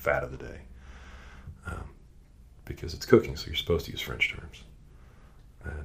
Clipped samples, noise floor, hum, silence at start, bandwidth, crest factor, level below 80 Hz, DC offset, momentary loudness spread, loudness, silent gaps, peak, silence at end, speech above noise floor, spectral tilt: under 0.1%; -53 dBFS; none; 0 s; 15.5 kHz; 30 dB; -46 dBFS; under 0.1%; 25 LU; -29 LUFS; none; -4 dBFS; 0 s; 24 dB; -5.5 dB/octave